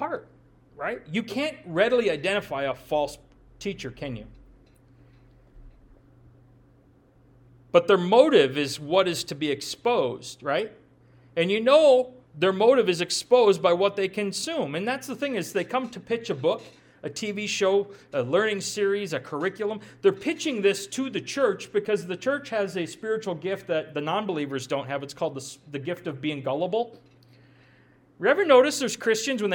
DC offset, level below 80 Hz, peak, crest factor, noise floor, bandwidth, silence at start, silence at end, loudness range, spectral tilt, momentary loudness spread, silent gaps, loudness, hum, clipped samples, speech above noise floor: under 0.1%; -62 dBFS; -4 dBFS; 22 dB; -58 dBFS; 18 kHz; 0 s; 0 s; 9 LU; -4 dB/octave; 13 LU; none; -25 LUFS; none; under 0.1%; 33 dB